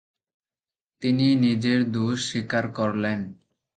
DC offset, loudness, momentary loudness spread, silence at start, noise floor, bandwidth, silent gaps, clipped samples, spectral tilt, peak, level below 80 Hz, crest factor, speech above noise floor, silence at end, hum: under 0.1%; -24 LUFS; 9 LU; 1 s; under -90 dBFS; 9.2 kHz; none; under 0.1%; -6 dB/octave; -10 dBFS; -62 dBFS; 16 dB; over 67 dB; 0.4 s; none